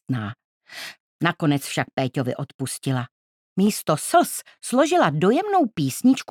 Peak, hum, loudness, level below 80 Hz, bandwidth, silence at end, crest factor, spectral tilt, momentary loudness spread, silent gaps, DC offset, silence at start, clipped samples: -2 dBFS; none; -22 LUFS; -70 dBFS; 18 kHz; 0.05 s; 20 dB; -5 dB/octave; 16 LU; 0.45-0.61 s, 1.00-1.19 s, 1.93-1.97 s, 2.54-2.59 s, 3.11-3.56 s; under 0.1%; 0.1 s; under 0.1%